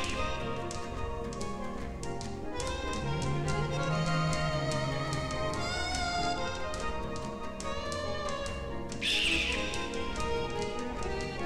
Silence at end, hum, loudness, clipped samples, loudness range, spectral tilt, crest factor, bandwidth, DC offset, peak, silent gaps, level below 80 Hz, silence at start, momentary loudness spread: 0 s; none; -33 LUFS; under 0.1%; 4 LU; -4.5 dB/octave; 16 dB; 15 kHz; 0.1%; -18 dBFS; none; -44 dBFS; 0 s; 9 LU